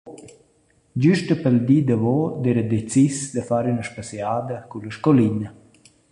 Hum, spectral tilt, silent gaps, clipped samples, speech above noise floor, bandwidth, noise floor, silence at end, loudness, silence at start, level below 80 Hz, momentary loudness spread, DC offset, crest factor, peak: none; -7 dB/octave; none; under 0.1%; 40 dB; 11 kHz; -61 dBFS; 0.6 s; -21 LUFS; 0.05 s; -56 dBFS; 14 LU; under 0.1%; 18 dB; -4 dBFS